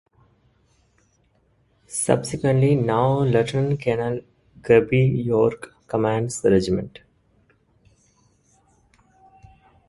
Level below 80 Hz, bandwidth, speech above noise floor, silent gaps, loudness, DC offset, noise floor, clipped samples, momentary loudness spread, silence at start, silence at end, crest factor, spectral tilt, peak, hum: -52 dBFS; 11.5 kHz; 43 dB; none; -21 LUFS; under 0.1%; -63 dBFS; under 0.1%; 10 LU; 1.9 s; 3 s; 20 dB; -6.5 dB/octave; -2 dBFS; none